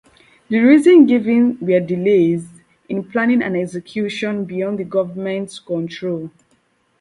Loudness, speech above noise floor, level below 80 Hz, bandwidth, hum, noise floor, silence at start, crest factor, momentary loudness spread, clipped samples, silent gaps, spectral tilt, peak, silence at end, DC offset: -17 LUFS; 45 dB; -62 dBFS; 11.5 kHz; none; -61 dBFS; 0.5 s; 16 dB; 14 LU; under 0.1%; none; -7 dB/octave; 0 dBFS; 0.75 s; under 0.1%